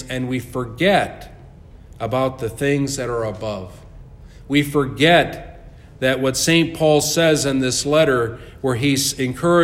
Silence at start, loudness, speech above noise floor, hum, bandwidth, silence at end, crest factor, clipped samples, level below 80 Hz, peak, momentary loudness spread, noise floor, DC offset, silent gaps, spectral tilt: 0 s; -19 LUFS; 23 dB; none; 16.5 kHz; 0 s; 18 dB; under 0.1%; -44 dBFS; -2 dBFS; 12 LU; -42 dBFS; under 0.1%; none; -4.5 dB/octave